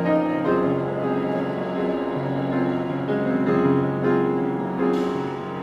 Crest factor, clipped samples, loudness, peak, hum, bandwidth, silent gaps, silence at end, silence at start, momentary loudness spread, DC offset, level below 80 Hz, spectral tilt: 14 dB; under 0.1%; -23 LUFS; -8 dBFS; none; 7.6 kHz; none; 0 s; 0 s; 5 LU; under 0.1%; -56 dBFS; -9 dB/octave